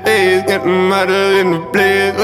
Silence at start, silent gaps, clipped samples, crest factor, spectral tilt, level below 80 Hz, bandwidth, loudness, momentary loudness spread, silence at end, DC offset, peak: 0 s; none; under 0.1%; 12 dB; -4.5 dB/octave; -52 dBFS; 15.5 kHz; -12 LUFS; 2 LU; 0 s; under 0.1%; -2 dBFS